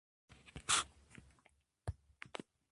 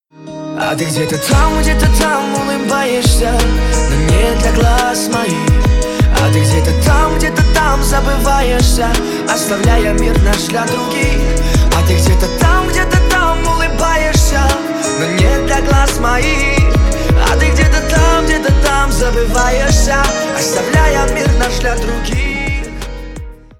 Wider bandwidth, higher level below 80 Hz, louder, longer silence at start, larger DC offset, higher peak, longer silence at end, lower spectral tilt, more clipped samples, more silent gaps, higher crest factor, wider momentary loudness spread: second, 11.5 kHz vs 16.5 kHz; second, -60 dBFS vs -14 dBFS; second, -40 LUFS vs -13 LUFS; first, 0.45 s vs 0.2 s; neither; second, -18 dBFS vs 0 dBFS; first, 0.8 s vs 0.25 s; second, -1 dB/octave vs -4.5 dB/octave; neither; neither; first, 28 dB vs 12 dB; first, 27 LU vs 5 LU